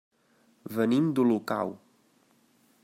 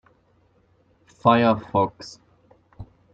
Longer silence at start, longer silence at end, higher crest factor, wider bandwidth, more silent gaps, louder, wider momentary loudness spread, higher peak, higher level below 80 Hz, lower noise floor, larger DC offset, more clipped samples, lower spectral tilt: second, 0.65 s vs 1.25 s; first, 1.1 s vs 0.3 s; second, 18 dB vs 24 dB; first, 16 kHz vs 7.8 kHz; neither; second, -27 LUFS vs -21 LUFS; second, 12 LU vs 22 LU; second, -12 dBFS vs -2 dBFS; second, -78 dBFS vs -58 dBFS; first, -66 dBFS vs -62 dBFS; neither; neither; about the same, -7.5 dB/octave vs -7 dB/octave